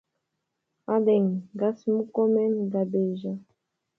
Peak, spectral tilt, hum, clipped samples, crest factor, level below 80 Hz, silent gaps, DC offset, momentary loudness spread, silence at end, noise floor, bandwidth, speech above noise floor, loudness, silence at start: -12 dBFS; -10.5 dB/octave; none; under 0.1%; 14 dB; -76 dBFS; none; under 0.1%; 12 LU; 0.55 s; -81 dBFS; 6 kHz; 56 dB; -26 LUFS; 0.9 s